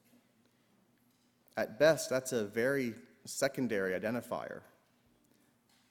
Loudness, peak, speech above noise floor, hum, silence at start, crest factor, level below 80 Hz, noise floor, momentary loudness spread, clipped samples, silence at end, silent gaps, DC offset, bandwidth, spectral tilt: -34 LUFS; -14 dBFS; 38 dB; none; 1.55 s; 22 dB; -74 dBFS; -71 dBFS; 15 LU; under 0.1%; 1.3 s; none; under 0.1%; 19 kHz; -4 dB/octave